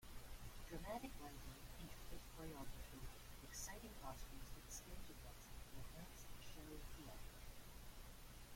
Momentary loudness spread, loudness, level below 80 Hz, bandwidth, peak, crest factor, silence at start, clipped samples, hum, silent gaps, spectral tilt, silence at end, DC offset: 8 LU; -57 LUFS; -58 dBFS; 16.5 kHz; -38 dBFS; 16 dB; 0 s; under 0.1%; none; none; -3.5 dB/octave; 0 s; under 0.1%